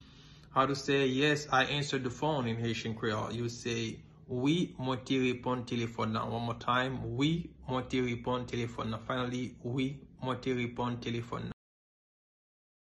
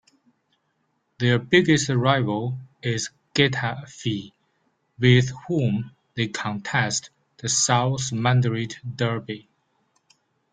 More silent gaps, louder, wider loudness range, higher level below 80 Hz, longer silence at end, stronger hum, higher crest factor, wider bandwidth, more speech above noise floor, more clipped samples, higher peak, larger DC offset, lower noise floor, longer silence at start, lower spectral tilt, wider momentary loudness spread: neither; second, -33 LUFS vs -23 LUFS; first, 5 LU vs 2 LU; about the same, -58 dBFS vs -58 dBFS; first, 1.3 s vs 1.15 s; neither; about the same, 18 dB vs 20 dB; first, 11.5 kHz vs 9.6 kHz; second, 22 dB vs 49 dB; neither; second, -14 dBFS vs -4 dBFS; neither; second, -55 dBFS vs -72 dBFS; second, 0 s vs 1.2 s; about the same, -5.5 dB/octave vs -4.5 dB/octave; second, 9 LU vs 12 LU